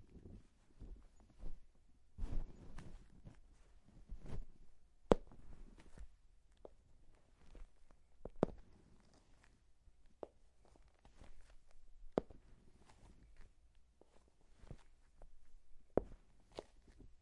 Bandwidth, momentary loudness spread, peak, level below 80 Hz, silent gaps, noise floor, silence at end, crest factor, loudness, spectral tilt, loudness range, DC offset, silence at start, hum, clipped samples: 10.5 kHz; 26 LU; -10 dBFS; -54 dBFS; none; -68 dBFS; 0.05 s; 38 dB; -45 LUFS; -7.5 dB/octave; 18 LU; under 0.1%; 0 s; none; under 0.1%